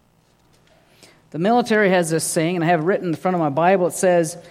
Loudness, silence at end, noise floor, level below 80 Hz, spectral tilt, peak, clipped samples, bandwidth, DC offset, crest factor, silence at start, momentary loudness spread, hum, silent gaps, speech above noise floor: -19 LUFS; 0 s; -58 dBFS; -66 dBFS; -5 dB/octave; -2 dBFS; under 0.1%; 15.5 kHz; under 0.1%; 18 dB; 1.35 s; 5 LU; none; none; 40 dB